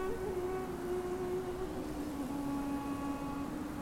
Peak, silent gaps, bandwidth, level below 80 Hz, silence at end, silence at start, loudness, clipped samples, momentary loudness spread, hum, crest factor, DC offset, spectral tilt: -26 dBFS; none; 16.5 kHz; -52 dBFS; 0 s; 0 s; -39 LUFS; under 0.1%; 3 LU; none; 12 dB; under 0.1%; -6.5 dB/octave